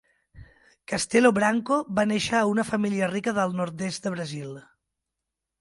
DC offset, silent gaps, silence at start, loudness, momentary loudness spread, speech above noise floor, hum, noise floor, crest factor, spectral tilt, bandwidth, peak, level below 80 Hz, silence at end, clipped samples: under 0.1%; none; 0.35 s; -25 LUFS; 13 LU; 61 dB; none; -85 dBFS; 20 dB; -5 dB/octave; 11.5 kHz; -6 dBFS; -60 dBFS; 1 s; under 0.1%